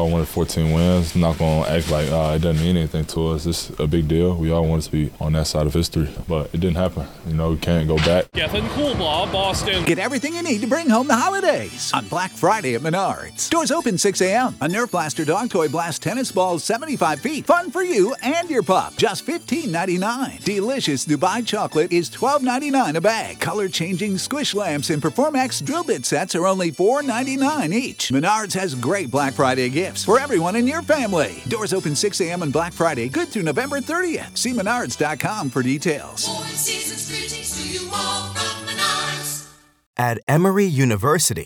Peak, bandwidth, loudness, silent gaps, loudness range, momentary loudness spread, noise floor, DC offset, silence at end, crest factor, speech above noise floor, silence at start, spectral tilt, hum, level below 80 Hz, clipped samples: -4 dBFS; 19 kHz; -20 LUFS; 39.86-39.94 s, 40.23-40.27 s; 2 LU; 6 LU; -42 dBFS; under 0.1%; 0 s; 18 dB; 22 dB; 0 s; -4.5 dB/octave; none; -38 dBFS; under 0.1%